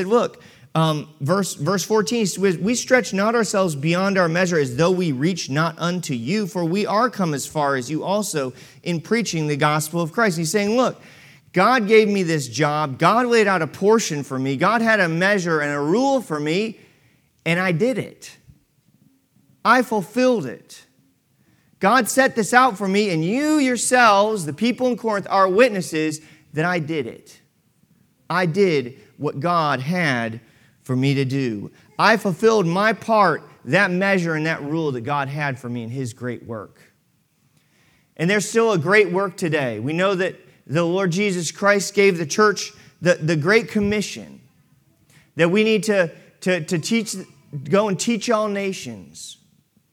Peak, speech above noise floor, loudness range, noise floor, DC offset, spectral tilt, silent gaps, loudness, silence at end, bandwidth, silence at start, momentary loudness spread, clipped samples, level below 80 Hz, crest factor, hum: 0 dBFS; 44 dB; 5 LU; -64 dBFS; under 0.1%; -5 dB/octave; none; -20 LUFS; 0.6 s; 18 kHz; 0 s; 12 LU; under 0.1%; -64 dBFS; 20 dB; none